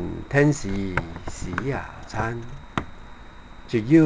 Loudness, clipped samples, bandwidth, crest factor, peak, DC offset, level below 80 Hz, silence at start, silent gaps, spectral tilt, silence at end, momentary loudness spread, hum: -26 LUFS; under 0.1%; 9.8 kHz; 20 dB; -6 dBFS; 0.3%; -40 dBFS; 0 s; none; -7 dB/octave; 0 s; 25 LU; none